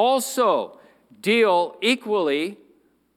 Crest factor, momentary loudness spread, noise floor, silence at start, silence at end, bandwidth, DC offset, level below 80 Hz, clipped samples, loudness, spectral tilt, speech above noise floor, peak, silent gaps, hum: 16 dB; 10 LU; -60 dBFS; 0 s; 0.6 s; 17 kHz; under 0.1%; -80 dBFS; under 0.1%; -21 LUFS; -3 dB/octave; 39 dB; -6 dBFS; none; none